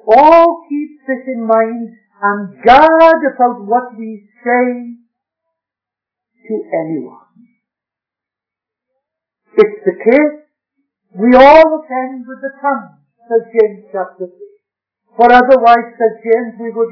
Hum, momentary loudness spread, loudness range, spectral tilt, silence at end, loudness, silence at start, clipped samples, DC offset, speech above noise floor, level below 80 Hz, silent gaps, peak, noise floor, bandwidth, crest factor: none; 18 LU; 16 LU; -6.5 dB/octave; 0 s; -11 LUFS; 0.05 s; 2%; under 0.1%; 75 dB; -46 dBFS; none; 0 dBFS; -86 dBFS; 5.4 kHz; 12 dB